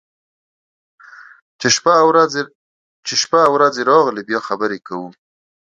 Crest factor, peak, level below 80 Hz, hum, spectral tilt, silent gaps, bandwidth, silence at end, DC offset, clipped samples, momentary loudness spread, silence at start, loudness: 18 dB; 0 dBFS; -64 dBFS; none; -2.5 dB/octave; 2.55-3.03 s; 9 kHz; 0.5 s; under 0.1%; under 0.1%; 17 LU; 1.6 s; -15 LUFS